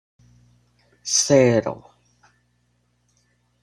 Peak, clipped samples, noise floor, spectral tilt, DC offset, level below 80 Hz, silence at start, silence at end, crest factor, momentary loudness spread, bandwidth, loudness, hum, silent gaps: -2 dBFS; under 0.1%; -67 dBFS; -4 dB/octave; under 0.1%; -58 dBFS; 1.05 s; 1.85 s; 22 dB; 20 LU; 14 kHz; -18 LUFS; 60 Hz at -45 dBFS; none